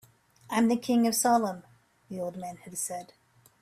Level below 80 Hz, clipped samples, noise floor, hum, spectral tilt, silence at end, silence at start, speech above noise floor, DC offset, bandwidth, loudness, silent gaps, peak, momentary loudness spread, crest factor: -72 dBFS; under 0.1%; -53 dBFS; none; -4 dB/octave; 0.55 s; 0.5 s; 26 dB; under 0.1%; 16 kHz; -28 LUFS; none; -14 dBFS; 17 LU; 16 dB